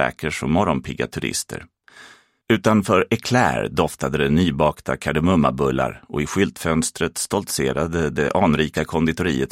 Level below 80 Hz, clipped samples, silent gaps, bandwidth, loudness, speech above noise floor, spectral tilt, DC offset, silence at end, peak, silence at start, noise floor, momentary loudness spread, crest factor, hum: -42 dBFS; under 0.1%; none; 16 kHz; -20 LUFS; 28 dB; -5 dB/octave; under 0.1%; 0.05 s; -2 dBFS; 0 s; -48 dBFS; 7 LU; 20 dB; none